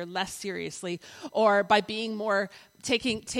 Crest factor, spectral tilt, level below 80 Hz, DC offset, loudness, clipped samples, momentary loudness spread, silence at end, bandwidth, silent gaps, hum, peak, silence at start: 20 dB; -3.5 dB/octave; -64 dBFS; under 0.1%; -28 LUFS; under 0.1%; 13 LU; 0 s; 16 kHz; none; none; -8 dBFS; 0 s